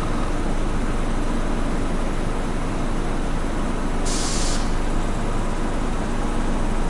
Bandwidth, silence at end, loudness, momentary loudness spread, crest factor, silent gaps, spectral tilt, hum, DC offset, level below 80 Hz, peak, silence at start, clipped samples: 11.5 kHz; 0 s; -26 LUFS; 3 LU; 12 dB; none; -5 dB/octave; none; under 0.1%; -22 dBFS; -8 dBFS; 0 s; under 0.1%